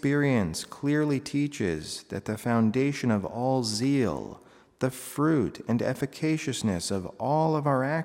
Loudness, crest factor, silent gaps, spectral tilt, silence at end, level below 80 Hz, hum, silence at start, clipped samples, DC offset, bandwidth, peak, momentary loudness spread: -28 LUFS; 16 dB; none; -6 dB/octave; 0 s; -60 dBFS; none; 0.05 s; under 0.1%; under 0.1%; 16 kHz; -12 dBFS; 7 LU